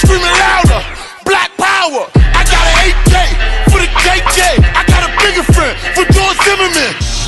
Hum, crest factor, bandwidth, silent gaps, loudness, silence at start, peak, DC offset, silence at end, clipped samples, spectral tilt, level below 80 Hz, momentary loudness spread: none; 8 dB; 12.5 kHz; none; -9 LUFS; 0 s; 0 dBFS; under 0.1%; 0 s; under 0.1%; -4 dB/octave; -14 dBFS; 5 LU